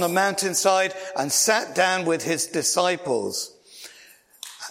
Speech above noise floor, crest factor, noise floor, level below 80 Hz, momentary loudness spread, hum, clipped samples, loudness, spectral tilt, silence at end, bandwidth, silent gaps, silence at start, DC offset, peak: 29 dB; 18 dB; -52 dBFS; -74 dBFS; 20 LU; none; under 0.1%; -22 LUFS; -2 dB/octave; 0 s; 16.5 kHz; none; 0 s; under 0.1%; -6 dBFS